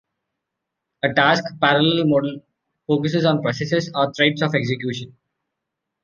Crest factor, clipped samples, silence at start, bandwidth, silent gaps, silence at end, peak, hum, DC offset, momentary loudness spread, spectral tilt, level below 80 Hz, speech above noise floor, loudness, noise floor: 20 dB; under 0.1%; 1.05 s; 7.2 kHz; none; 0.95 s; -2 dBFS; none; under 0.1%; 11 LU; -6 dB/octave; -62 dBFS; 62 dB; -19 LUFS; -81 dBFS